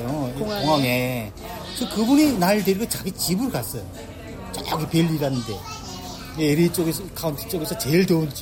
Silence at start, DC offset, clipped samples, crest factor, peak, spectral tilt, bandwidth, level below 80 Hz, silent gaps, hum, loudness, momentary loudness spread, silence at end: 0 s; under 0.1%; under 0.1%; 14 dB; -8 dBFS; -5 dB/octave; 17 kHz; -44 dBFS; none; none; -22 LUFS; 15 LU; 0 s